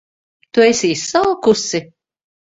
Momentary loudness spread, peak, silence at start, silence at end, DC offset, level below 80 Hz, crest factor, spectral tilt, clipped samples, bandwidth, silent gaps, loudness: 8 LU; 0 dBFS; 0.55 s; 0.7 s; under 0.1%; -56 dBFS; 16 dB; -3.5 dB/octave; under 0.1%; 8 kHz; none; -15 LUFS